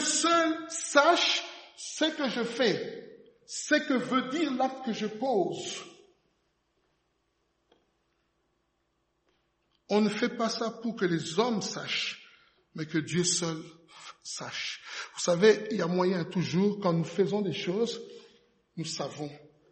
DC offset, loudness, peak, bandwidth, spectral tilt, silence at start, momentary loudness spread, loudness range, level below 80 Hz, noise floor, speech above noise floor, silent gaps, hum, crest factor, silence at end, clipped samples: under 0.1%; -29 LUFS; -6 dBFS; 8.8 kHz; -4 dB/octave; 0 s; 17 LU; 7 LU; -76 dBFS; -76 dBFS; 47 dB; none; none; 24 dB; 0.3 s; under 0.1%